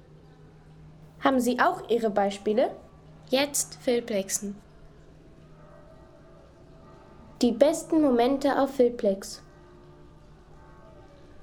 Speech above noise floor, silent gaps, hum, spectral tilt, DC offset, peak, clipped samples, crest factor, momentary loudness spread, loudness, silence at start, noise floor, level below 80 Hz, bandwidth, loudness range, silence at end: 27 dB; none; none; -3.5 dB/octave; under 0.1%; -6 dBFS; under 0.1%; 22 dB; 9 LU; -25 LUFS; 0.85 s; -51 dBFS; -56 dBFS; 19 kHz; 8 LU; 0 s